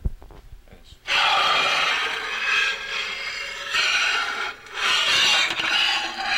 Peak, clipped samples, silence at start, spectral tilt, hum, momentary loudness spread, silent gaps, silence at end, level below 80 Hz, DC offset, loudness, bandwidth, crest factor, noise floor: -8 dBFS; under 0.1%; 0 s; 0 dB/octave; none; 11 LU; none; 0 s; -44 dBFS; under 0.1%; -20 LUFS; 16 kHz; 16 dB; -47 dBFS